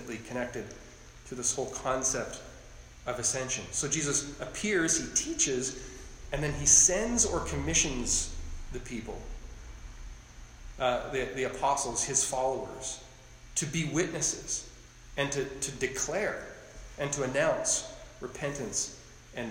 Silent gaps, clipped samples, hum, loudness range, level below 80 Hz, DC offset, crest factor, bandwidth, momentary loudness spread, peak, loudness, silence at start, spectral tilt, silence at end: none; under 0.1%; none; 8 LU; -46 dBFS; under 0.1%; 24 dB; 16 kHz; 19 LU; -8 dBFS; -29 LUFS; 0 s; -2.5 dB/octave; 0 s